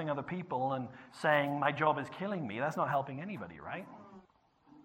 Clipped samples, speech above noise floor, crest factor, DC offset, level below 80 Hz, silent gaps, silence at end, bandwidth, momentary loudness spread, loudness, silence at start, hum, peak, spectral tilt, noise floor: under 0.1%; 33 dB; 22 dB; under 0.1%; -74 dBFS; none; 0 s; 16 kHz; 14 LU; -35 LUFS; 0 s; none; -14 dBFS; -6.5 dB/octave; -67 dBFS